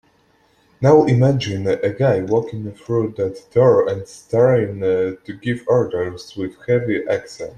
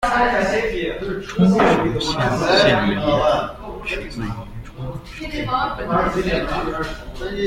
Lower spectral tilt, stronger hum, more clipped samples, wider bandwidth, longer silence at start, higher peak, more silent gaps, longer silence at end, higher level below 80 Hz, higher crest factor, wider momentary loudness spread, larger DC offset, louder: first, -7.5 dB/octave vs -5.5 dB/octave; neither; neither; second, 9.6 kHz vs 15 kHz; first, 0.8 s vs 0 s; about the same, -2 dBFS vs -2 dBFS; neither; about the same, 0.05 s vs 0 s; second, -54 dBFS vs -34 dBFS; about the same, 16 dB vs 18 dB; second, 13 LU vs 16 LU; neither; about the same, -18 LUFS vs -19 LUFS